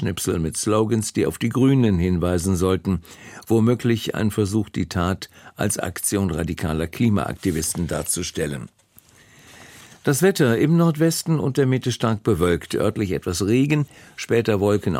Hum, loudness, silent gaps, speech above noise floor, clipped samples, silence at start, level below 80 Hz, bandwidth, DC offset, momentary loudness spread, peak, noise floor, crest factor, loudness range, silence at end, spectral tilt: none; -21 LUFS; none; 32 dB; under 0.1%; 0 s; -44 dBFS; 16.5 kHz; under 0.1%; 8 LU; -6 dBFS; -53 dBFS; 16 dB; 4 LU; 0 s; -5.5 dB/octave